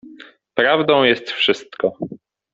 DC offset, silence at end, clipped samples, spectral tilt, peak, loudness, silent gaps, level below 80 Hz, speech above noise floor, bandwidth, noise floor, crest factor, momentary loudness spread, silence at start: under 0.1%; 0.35 s; under 0.1%; -5 dB/octave; -2 dBFS; -17 LUFS; none; -62 dBFS; 26 dB; 7.8 kHz; -43 dBFS; 18 dB; 13 LU; 0.05 s